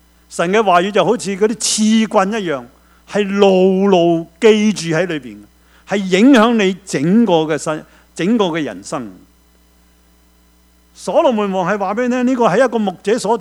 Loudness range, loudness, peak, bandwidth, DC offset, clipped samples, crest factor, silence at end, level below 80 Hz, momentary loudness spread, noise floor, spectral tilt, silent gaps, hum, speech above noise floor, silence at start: 7 LU; -15 LUFS; 0 dBFS; 13 kHz; under 0.1%; under 0.1%; 16 dB; 0 s; -54 dBFS; 12 LU; -51 dBFS; -5 dB/octave; none; none; 37 dB; 0.3 s